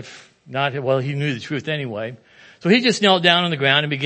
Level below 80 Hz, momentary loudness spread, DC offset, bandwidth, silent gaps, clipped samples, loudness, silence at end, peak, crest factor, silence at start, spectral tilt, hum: -68 dBFS; 14 LU; under 0.1%; 8.8 kHz; none; under 0.1%; -18 LUFS; 0 s; 0 dBFS; 20 dB; 0 s; -5 dB/octave; none